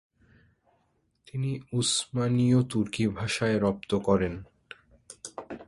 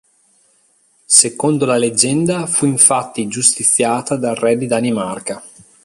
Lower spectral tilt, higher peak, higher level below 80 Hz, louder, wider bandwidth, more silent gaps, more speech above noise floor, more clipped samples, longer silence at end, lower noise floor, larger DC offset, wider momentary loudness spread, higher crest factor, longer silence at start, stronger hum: first, -5 dB/octave vs -3 dB/octave; second, -10 dBFS vs 0 dBFS; about the same, -54 dBFS vs -58 dBFS; second, -27 LUFS vs -14 LUFS; second, 11.5 kHz vs 16 kHz; neither; first, 45 dB vs 41 dB; neither; second, 0.05 s vs 0.35 s; first, -71 dBFS vs -57 dBFS; neither; first, 19 LU vs 12 LU; about the same, 20 dB vs 16 dB; first, 1.35 s vs 1.1 s; neither